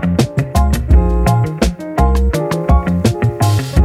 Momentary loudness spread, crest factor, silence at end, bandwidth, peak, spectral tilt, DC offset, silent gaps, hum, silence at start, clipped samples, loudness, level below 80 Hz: 4 LU; 12 dB; 0 s; 15 kHz; 0 dBFS; -7 dB/octave; under 0.1%; none; none; 0 s; under 0.1%; -15 LUFS; -16 dBFS